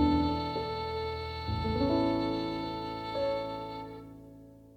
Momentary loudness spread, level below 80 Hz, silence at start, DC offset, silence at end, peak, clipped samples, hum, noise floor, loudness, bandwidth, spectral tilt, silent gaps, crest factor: 18 LU; -46 dBFS; 0 s; under 0.1%; 0.05 s; -14 dBFS; under 0.1%; none; -52 dBFS; -33 LUFS; 8.4 kHz; -7.5 dB/octave; none; 18 dB